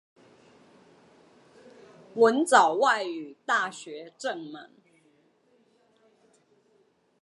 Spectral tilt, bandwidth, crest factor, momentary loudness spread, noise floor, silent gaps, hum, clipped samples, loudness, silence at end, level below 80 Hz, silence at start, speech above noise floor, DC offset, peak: -2.5 dB/octave; 11.5 kHz; 26 dB; 21 LU; -67 dBFS; none; none; under 0.1%; -25 LUFS; 2.6 s; -86 dBFS; 2.15 s; 41 dB; under 0.1%; -4 dBFS